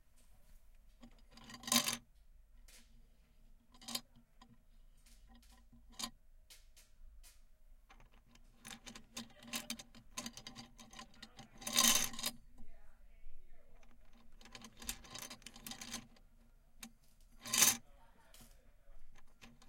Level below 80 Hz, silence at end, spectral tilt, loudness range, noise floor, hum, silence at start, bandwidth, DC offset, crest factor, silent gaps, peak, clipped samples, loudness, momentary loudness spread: -60 dBFS; 0 s; 0 dB/octave; 17 LU; -64 dBFS; none; 0.15 s; 17 kHz; under 0.1%; 32 dB; none; -14 dBFS; under 0.1%; -37 LUFS; 27 LU